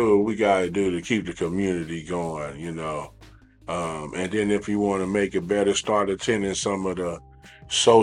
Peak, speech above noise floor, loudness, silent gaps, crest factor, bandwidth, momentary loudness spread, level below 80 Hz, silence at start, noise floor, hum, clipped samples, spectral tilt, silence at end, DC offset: -4 dBFS; 26 dB; -25 LUFS; none; 20 dB; 11.5 kHz; 11 LU; -52 dBFS; 0 s; -50 dBFS; none; under 0.1%; -4.5 dB/octave; 0 s; under 0.1%